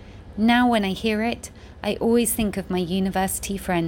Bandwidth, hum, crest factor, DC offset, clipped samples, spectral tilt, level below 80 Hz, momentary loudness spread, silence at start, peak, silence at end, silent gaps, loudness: 17 kHz; none; 16 dB; under 0.1%; under 0.1%; -4.5 dB/octave; -42 dBFS; 12 LU; 0 s; -8 dBFS; 0 s; none; -22 LUFS